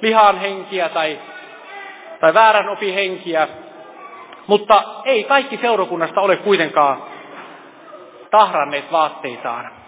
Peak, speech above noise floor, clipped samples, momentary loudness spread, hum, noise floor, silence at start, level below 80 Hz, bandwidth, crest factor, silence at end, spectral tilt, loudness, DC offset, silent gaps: 0 dBFS; 23 dB; under 0.1%; 22 LU; none; -39 dBFS; 0 s; -68 dBFS; 4 kHz; 18 dB; 0.15 s; -7.5 dB/octave; -16 LUFS; under 0.1%; none